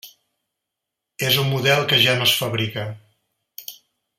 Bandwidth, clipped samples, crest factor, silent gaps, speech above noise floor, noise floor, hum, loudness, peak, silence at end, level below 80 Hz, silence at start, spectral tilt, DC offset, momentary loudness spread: 16.5 kHz; under 0.1%; 20 dB; none; 63 dB; -83 dBFS; none; -18 LUFS; -2 dBFS; 0.45 s; -62 dBFS; 0.05 s; -3.5 dB/octave; under 0.1%; 21 LU